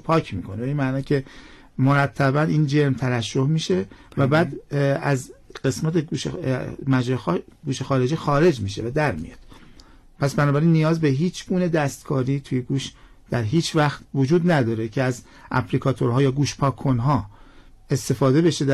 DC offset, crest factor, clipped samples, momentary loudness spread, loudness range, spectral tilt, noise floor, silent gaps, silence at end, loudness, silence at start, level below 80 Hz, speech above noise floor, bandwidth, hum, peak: under 0.1%; 12 dB; under 0.1%; 9 LU; 2 LU; -6.5 dB/octave; -48 dBFS; none; 0 s; -22 LUFS; 0.05 s; -48 dBFS; 26 dB; 12.5 kHz; none; -10 dBFS